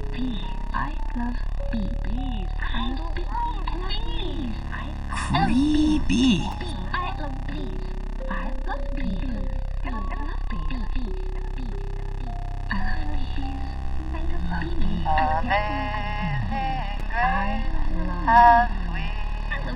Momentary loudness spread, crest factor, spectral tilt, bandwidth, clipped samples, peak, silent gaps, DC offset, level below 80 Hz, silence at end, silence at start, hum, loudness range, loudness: 12 LU; 20 dB; -6 dB/octave; 10.5 kHz; under 0.1%; -4 dBFS; none; under 0.1%; -26 dBFS; 0 s; 0 s; none; 10 LU; -26 LUFS